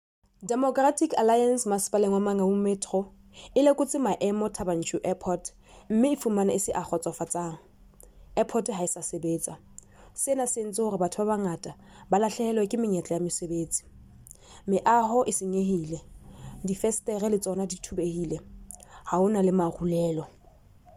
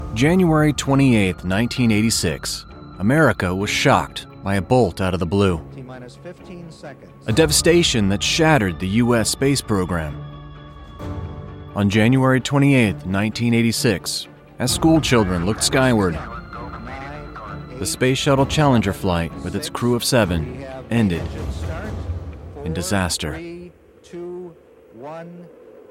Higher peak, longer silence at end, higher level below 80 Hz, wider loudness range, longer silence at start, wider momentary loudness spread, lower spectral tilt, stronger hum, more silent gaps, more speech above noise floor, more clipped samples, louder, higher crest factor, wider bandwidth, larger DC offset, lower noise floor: second, -10 dBFS vs -2 dBFS; first, 0.65 s vs 0.1 s; second, -56 dBFS vs -38 dBFS; about the same, 5 LU vs 7 LU; first, 0.4 s vs 0 s; second, 14 LU vs 20 LU; about the same, -5.5 dB/octave vs -5 dB/octave; neither; neither; about the same, 29 dB vs 27 dB; neither; second, -27 LUFS vs -19 LUFS; about the same, 18 dB vs 18 dB; about the same, 16 kHz vs 16.5 kHz; neither; first, -55 dBFS vs -45 dBFS